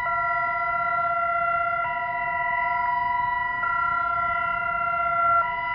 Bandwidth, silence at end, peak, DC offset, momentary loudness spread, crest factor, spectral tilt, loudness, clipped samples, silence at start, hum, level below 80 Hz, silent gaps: 5.2 kHz; 0 s; -12 dBFS; under 0.1%; 3 LU; 12 dB; -7 dB/octave; -24 LUFS; under 0.1%; 0 s; none; -52 dBFS; none